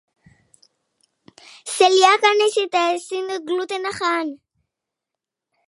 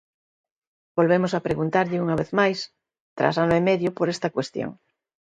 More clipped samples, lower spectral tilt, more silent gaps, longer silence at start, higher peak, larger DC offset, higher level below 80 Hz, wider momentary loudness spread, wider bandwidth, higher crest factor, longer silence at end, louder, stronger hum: neither; second, -1 dB/octave vs -6.5 dB/octave; second, none vs 3.00-3.16 s; first, 1.65 s vs 0.95 s; first, 0 dBFS vs -4 dBFS; neither; second, -72 dBFS vs -58 dBFS; about the same, 13 LU vs 11 LU; first, 11.5 kHz vs 9.2 kHz; about the same, 20 dB vs 20 dB; first, 1.3 s vs 0.5 s; first, -18 LUFS vs -23 LUFS; neither